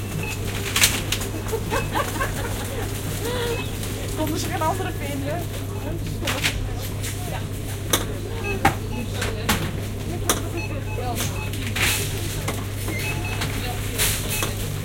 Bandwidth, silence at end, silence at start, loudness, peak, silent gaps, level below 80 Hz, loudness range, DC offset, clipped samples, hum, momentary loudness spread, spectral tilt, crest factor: 17 kHz; 0 s; 0 s; -25 LUFS; -2 dBFS; none; -34 dBFS; 3 LU; under 0.1%; under 0.1%; none; 8 LU; -3.5 dB/octave; 24 dB